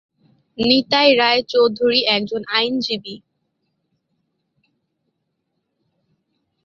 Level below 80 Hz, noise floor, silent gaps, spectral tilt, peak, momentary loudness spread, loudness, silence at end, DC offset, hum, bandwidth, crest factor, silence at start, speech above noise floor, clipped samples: -60 dBFS; -74 dBFS; none; -4.5 dB/octave; 0 dBFS; 10 LU; -16 LUFS; 3.5 s; under 0.1%; none; 7.4 kHz; 20 dB; 0.6 s; 57 dB; under 0.1%